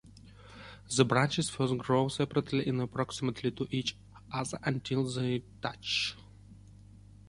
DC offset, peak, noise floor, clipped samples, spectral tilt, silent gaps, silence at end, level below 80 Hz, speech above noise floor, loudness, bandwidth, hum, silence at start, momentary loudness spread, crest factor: under 0.1%; -10 dBFS; -54 dBFS; under 0.1%; -5 dB/octave; none; 0.75 s; -60 dBFS; 22 dB; -32 LUFS; 11.5 kHz; none; 0.05 s; 12 LU; 24 dB